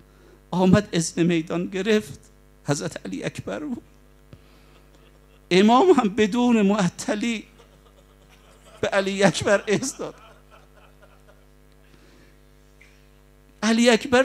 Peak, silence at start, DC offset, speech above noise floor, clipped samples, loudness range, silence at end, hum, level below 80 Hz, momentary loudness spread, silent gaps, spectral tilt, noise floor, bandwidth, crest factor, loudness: -2 dBFS; 0.5 s; under 0.1%; 32 dB; under 0.1%; 12 LU; 0 s; none; -54 dBFS; 14 LU; none; -5 dB/octave; -53 dBFS; 13.5 kHz; 22 dB; -22 LUFS